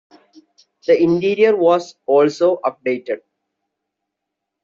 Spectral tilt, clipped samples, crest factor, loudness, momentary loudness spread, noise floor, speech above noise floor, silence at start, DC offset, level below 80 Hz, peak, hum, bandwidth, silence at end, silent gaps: -5 dB/octave; under 0.1%; 16 dB; -17 LUFS; 12 LU; -80 dBFS; 64 dB; 0.9 s; under 0.1%; -64 dBFS; -2 dBFS; none; 7.6 kHz; 1.45 s; none